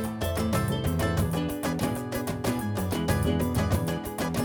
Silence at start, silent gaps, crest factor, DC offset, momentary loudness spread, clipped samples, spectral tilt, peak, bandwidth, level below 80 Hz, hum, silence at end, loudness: 0 s; none; 14 dB; under 0.1%; 4 LU; under 0.1%; -6 dB/octave; -14 dBFS; over 20 kHz; -40 dBFS; none; 0 s; -28 LUFS